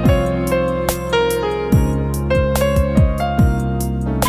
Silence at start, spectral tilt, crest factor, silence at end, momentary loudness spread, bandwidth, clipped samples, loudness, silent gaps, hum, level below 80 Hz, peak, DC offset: 0 s; -6.5 dB/octave; 16 dB; 0 s; 4 LU; 16 kHz; under 0.1%; -17 LUFS; none; none; -22 dBFS; 0 dBFS; under 0.1%